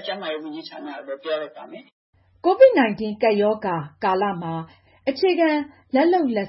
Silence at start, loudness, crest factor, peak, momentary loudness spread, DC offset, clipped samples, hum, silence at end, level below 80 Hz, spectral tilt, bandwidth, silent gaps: 0 s; -21 LUFS; 18 dB; -4 dBFS; 20 LU; under 0.1%; under 0.1%; none; 0 s; -66 dBFS; -10 dB/octave; 5.8 kHz; 1.92-2.13 s